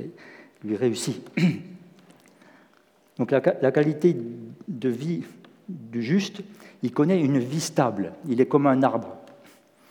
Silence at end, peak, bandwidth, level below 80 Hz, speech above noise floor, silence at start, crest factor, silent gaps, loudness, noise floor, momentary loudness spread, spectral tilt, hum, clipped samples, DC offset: 0.6 s; -6 dBFS; 18.5 kHz; -80 dBFS; 36 dB; 0 s; 20 dB; none; -24 LUFS; -60 dBFS; 20 LU; -6.5 dB/octave; none; under 0.1%; under 0.1%